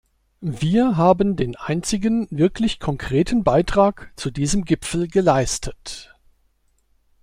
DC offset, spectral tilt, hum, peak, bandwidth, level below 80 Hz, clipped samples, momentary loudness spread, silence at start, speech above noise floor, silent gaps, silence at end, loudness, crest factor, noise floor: under 0.1%; -5.5 dB/octave; none; -2 dBFS; 15.5 kHz; -38 dBFS; under 0.1%; 14 LU; 0.4 s; 44 dB; none; 1.2 s; -20 LUFS; 18 dB; -63 dBFS